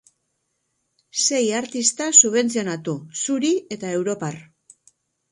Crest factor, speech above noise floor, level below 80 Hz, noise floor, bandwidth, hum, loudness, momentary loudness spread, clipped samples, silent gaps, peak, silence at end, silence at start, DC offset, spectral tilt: 22 dB; 52 dB; -70 dBFS; -74 dBFS; 11.5 kHz; none; -19 LUFS; 16 LU; under 0.1%; none; 0 dBFS; 0.9 s; 1.15 s; under 0.1%; -2.5 dB/octave